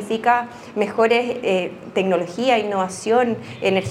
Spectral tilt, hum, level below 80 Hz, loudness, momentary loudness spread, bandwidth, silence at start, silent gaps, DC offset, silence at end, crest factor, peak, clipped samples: -5 dB/octave; none; -64 dBFS; -20 LUFS; 6 LU; 13 kHz; 0 s; none; under 0.1%; 0 s; 18 dB; -2 dBFS; under 0.1%